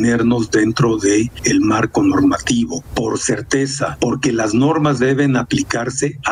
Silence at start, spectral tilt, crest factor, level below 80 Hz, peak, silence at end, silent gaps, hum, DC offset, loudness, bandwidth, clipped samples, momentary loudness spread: 0 s; -5 dB/octave; 12 dB; -42 dBFS; -4 dBFS; 0 s; none; none; under 0.1%; -16 LUFS; 11.5 kHz; under 0.1%; 5 LU